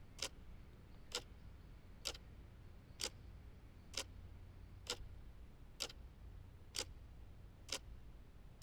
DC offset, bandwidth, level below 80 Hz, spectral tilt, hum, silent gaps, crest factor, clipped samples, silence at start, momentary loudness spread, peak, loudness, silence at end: under 0.1%; over 20 kHz; -58 dBFS; -2 dB/octave; none; none; 28 dB; under 0.1%; 0 s; 15 LU; -24 dBFS; -50 LUFS; 0 s